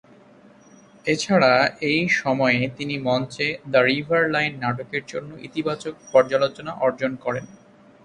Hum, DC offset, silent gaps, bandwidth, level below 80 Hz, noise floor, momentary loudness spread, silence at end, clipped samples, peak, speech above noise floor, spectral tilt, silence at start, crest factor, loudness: none; under 0.1%; none; 11 kHz; -60 dBFS; -50 dBFS; 11 LU; 0.55 s; under 0.1%; -2 dBFS; 29 dB; -5 dB/octave; 1.05 s; 20 dB; -22 LUFS